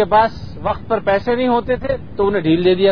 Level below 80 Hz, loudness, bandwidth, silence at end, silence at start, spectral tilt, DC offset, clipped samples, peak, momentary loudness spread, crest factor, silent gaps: -38 dBFS; -17 LUFS; 5.4 kHz; 0 s; 0 s; -8.5 dB/octave; 2%; under 0.1%; -2 dBFS; 9 LU; 14 dB; none